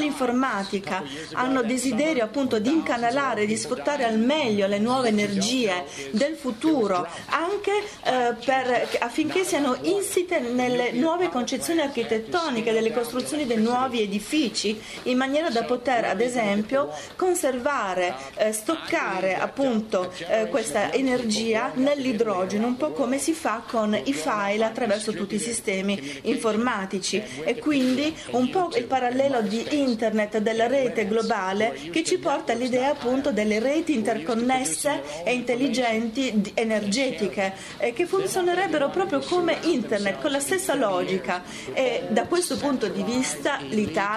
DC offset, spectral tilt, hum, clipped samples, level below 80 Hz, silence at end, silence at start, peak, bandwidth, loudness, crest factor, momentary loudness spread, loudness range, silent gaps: under 0.1%; -4 dB/octave; none; under 0.1%; -60 dBFS; 0 s; 0 s; -6 dBFS; 13.5 kHz; -24 LUFS; 18 dB; 4 LU; 2 LU; none